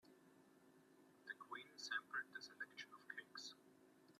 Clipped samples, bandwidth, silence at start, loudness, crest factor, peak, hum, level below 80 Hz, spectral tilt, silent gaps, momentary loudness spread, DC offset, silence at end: under 0.1%; 14 kHz; 0.05 s; -52 LUFS; 22 dB; -34 dBFS; none; under -90 dBFS; -0.5 dB/octave; none; 11 LU; under 0.1%; 0.05 s